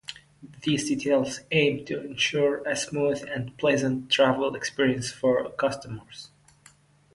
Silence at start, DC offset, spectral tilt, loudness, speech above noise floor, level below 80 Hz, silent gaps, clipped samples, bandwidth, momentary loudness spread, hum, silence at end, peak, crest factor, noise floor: 0.1 s; under 0.1%; -4.5 dB/octave; -25 LUFS; 32 dB; -62 dBFS; none; under 0.1%; 11.5 kHz; 11 LU; none; 0.9 s; -8 dBFS; 18 dB; -57 dBFS